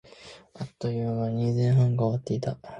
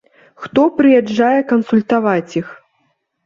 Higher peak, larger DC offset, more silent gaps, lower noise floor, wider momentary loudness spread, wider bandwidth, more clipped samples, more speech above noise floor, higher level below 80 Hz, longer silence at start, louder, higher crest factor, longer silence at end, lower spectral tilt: second, -12 dBFS vs -2 dBFS; neither; neither; second, -49 dBFS vs -65 dBFS; first, 22 LU vs 12 LU; first, 8.2 kHz vs 7.4 kHz; neither; second, 24 dB vs 51 dB; about the same, -58 dBFS vs -58 dBFS; second, 0.2 s vs 0.4 s; second, -26 LUFS vs -14 LUFS; about the same, 14 dB vs 14 dB; second, 0 s vs 0.7 s; first, -8.5 dB/octave vs -7 dB/octave